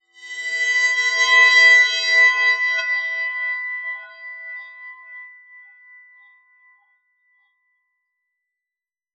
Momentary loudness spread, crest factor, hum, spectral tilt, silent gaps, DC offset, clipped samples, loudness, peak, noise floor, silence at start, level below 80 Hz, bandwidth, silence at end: 25 LU; 18 dB; none; 6.5 dB/octave; none; under 0.1%; under 0.1%; -15 LUFS; -4 dBFS; -89 dBFS; 0.2 s; under -90 dBFS; 9.2 kHz; 3.85 s